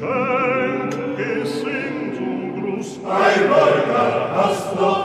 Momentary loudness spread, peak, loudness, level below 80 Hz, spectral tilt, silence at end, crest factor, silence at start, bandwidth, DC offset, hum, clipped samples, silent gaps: 11 LU; -2 dBFS; -19 LUFS; -64 dBFS; -5.5 dB/octave; 0 s; 16 dB; 0 s; 13.5 kHz; under 0.1%; none; under 0.1%; none